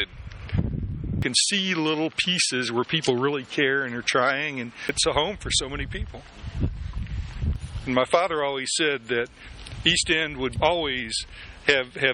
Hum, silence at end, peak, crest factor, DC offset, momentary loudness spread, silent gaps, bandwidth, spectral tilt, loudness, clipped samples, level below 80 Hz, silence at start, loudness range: none; 0 s; -2 dBFS; 24 dB; under 0.1%; 12 LU; none; 10.5 kHz; -3 dB/octave; -24 LUFS; under 0.1%; -38 dBFS; 0 s; 4 LU